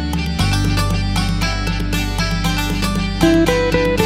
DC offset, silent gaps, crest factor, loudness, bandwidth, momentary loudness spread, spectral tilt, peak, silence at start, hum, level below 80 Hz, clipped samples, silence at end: under 0.1%; none; 16 dB; -17 LUFS; 16 kHz; 6 LU; -5.5 dB/octave; 0 dBFS; 0 s; none; -24 dBFS; under 0.1%; 0 s